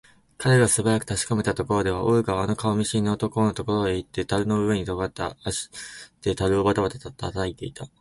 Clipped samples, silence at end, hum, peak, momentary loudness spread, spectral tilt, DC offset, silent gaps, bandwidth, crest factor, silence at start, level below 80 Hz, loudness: under 0.1%; 0.15 s; none; -6 dBFS; 10 LU; -5 dB/octave; under 0.1%; none; 11.5 kHz; 18 dB; 0.4 s; -46 dBFS; -24 LUFS